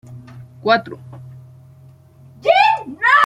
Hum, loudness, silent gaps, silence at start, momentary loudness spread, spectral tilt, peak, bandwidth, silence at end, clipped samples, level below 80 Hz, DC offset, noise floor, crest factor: none; -16 LUFS; none; 0.1 s; 25 LU; -4.5 dB/octave; -2 dBFS; 12 kHz; 0 s; under 0.1%; -62 dBFS; under 0.1%; -45 dBFS; 18 dB